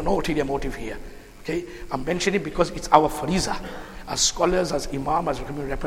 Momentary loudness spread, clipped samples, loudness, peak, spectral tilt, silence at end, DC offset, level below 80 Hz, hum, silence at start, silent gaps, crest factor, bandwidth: 16 LU; under 0.1%; -24 LUFS; 0 dBFS; -4 dB/octave; 0 s; under 0.1%; -38 dBFS; none; 0 s; none; 24 dB; 16 kHz